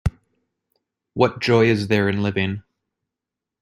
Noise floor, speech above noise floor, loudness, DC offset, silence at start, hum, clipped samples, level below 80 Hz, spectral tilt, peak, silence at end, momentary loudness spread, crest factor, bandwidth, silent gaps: -86 dBFS; 67 dB; -20 LUFS; under 0.1%; 0.05 s; none; under 0.1%; -42 dBFS; -7 dB/octave; -2 dBFS; 1 s; 13 LU; 20 dB; 13.5 kHz; none